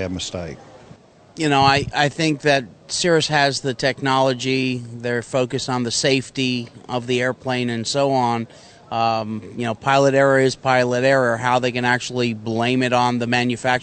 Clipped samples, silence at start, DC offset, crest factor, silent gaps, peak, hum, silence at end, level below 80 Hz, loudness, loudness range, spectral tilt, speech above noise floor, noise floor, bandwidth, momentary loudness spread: under 0.1%; 0 s; under 0.1%; 18 dB; none; -2 dBFS; none; 0 s; -52 dBFS; -19 LUFS; 4 LU; -4.5 dB/octave; 27 dB; -47 dBFS; 9.2 kHz; 10 LU